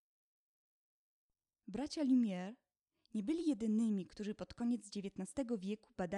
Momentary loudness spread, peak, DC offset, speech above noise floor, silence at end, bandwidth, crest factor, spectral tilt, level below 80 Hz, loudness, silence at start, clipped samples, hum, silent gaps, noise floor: 11 LU; -24 dBFS; under 0.1%; 43 dB; 0 s; 11 kHz; 16 dB; -6.5 dB/octave; -72 dBFS; -40 LUFS; 1.7 s; under 0.1%; none; none; -81 dBFS